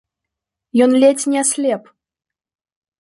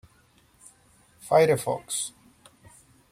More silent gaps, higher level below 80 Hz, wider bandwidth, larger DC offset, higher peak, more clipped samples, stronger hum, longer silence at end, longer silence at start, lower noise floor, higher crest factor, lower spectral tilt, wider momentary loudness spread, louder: neither; about the same, -68 dBFS vs -66 dBFS; second, 11.5 kHz vs 16 kHz; neither; first, -2 dBFS vs -8 dBFS; neither; neither; first, 1.2 s vs 1 s; second, 0.75 s vs 1.25 s; first, -82 dBFS vs -61 dBFS; about the same, 16 dB vs 20 dB; about the same, -3 dB/octave vs -4 dB/octave; second, 9 LU vs 14 LU; first, -15 LUFS vs -25 LUFS